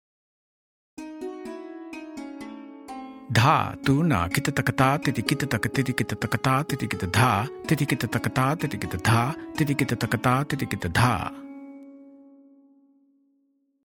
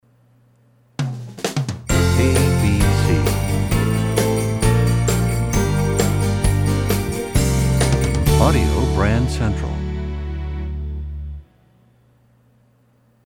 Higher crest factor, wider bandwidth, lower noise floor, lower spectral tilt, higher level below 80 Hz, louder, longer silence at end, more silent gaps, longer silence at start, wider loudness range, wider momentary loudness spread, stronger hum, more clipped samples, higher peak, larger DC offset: about the same, 22 dB vs 18 dB; about the same, 17.5 kHz vs 18 kHz; first, -69 dBFS vs -57 dBFS; about the same, -5.5 dB/octave vs -6 dB/octave; second, -54 dBFS vs -26 dBFS; second, -24 LUFS vs -19 LUFS; second, 1.65 s vs 1.85 s; neither; about the same, 1 s vs 1 s; about the same, 6 LU vs 8 LU; first, 18 LU vs 11 LU; neither; neither; about the same, -4 dBFS vs -2 dBFS; neither